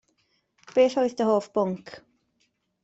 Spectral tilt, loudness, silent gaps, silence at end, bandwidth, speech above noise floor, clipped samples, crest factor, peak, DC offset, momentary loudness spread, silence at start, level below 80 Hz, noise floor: -6 dB/octave; -24 LUFS; none; 0.85 s; 8 kHz; 49 dB; under 0.1%; 18 dB; -8 dBFS; under 0.1%; 12 LU; 0.75 s; -72 dBFS; -72 dBFS